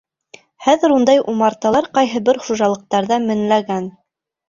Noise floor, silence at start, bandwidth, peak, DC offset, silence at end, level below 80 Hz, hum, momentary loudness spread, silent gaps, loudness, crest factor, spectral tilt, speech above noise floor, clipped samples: -47 dBFS; 0.6 s; 7.6 kHz; 0 dBFS; under 0.1%; 0.6 s; -58 dBFS; none; 7 LU; none; -16 LUFS; 16 dB; -5 dB/octave; 31 dB; under 0.1%